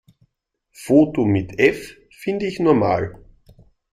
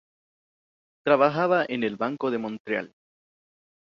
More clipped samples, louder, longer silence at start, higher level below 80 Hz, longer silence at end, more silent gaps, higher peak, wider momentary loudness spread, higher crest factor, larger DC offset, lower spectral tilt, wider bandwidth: neither; first, -19 LUFS vs -25 LUFS; second, 0.8 s vs 1.05 s; first, -50 dBFS vs -72 dBFS; second, 0.8 s vs 1.1 s; second, none vs 2.60-2.65 s; first, 0 dBFS vs -6 dBFS; first, 16 LU vs 10 LU; about the same, 20 dB vs 22 dB; neither; about the same, -7 dB/octave vs -7.5 dB/octave; first, 14.5 kHz vs 6.8 kHz